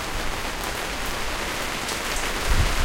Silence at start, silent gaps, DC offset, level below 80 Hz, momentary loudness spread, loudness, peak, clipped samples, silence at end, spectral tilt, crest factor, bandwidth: 0 s; none; under 0.1%; -28 dBFS; 4 LU; -26 LUFS; -6 dBFS; under 0.1%; 0 s; -3 dB/octave; 18 dB; 17 kHz